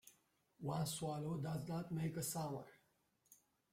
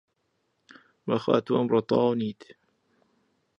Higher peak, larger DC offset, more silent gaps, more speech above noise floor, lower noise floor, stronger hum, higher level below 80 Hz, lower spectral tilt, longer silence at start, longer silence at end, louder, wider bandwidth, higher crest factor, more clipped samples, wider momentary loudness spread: second, -30 dBFS vs -6 dBFS; neither; neither; second, 37 dB vs 50 dB; first, -80 dBFS vs -75 dBFS; neither; about the same, -74 dBFS vs -70 dBFS; second, -5.5 dB/octave vs -8 dB/octave; second, 0.05 s vs 1.05 s; second, 0.4 s vs 1.3 s; second, -44 LUFS vs -26 LUFS; first, 16.5 kHz vs 7 kHz; second, 16 dB vs 22 dB; neither; second, 7 LU vs 13 LU